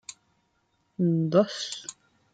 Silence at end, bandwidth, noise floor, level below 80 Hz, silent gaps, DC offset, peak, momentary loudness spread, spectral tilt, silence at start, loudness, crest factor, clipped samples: 0.4 s; 9.2 kHz; -72 dBFS; -74 dBFS; none; under 0.1%; -8 dBFS; 21 LU; -6 dB/octave; 0.1 s; -26 LUFS; 20 dB; under 0.1%